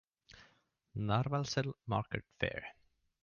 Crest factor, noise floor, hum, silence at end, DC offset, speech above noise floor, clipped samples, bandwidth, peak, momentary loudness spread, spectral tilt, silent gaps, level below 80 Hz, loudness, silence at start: 20 dB; -72 dBFS; none; 0.5 s; under 0.1%; 35 dB; under 0.1%; 7 kHz; -18 dBFS; 12 LU; -5 dB/octave; none; -60 dBFS; -38 LUFS; 0.35 s